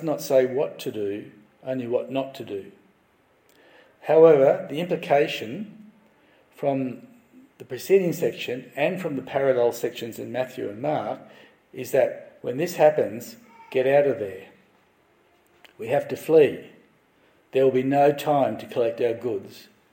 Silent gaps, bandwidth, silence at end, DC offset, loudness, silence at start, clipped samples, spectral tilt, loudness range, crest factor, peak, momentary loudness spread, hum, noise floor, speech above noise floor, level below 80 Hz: none; 17 kHz; 0.35 s; under 0.1%; -23 LUFS; 0 s; under 0.1%; -6 dB/octave; 6 LU; 20 dB; -4 dBFS; 17 LU; none; -62 dBFS; 39 dB; -74 dBFS